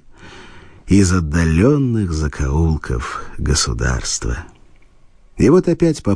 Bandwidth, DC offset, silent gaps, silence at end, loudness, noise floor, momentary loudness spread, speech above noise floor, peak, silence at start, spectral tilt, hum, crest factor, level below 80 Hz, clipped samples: 10.5 kHz; under 0.1%; none; 0 s; -17 LUFS; -46 dBFS; 10 LU; 30 dB; -2 dBFS; 0.25 s; -5.5 dB/octave; none; 14 dB; -26 dBFS; under 0.1%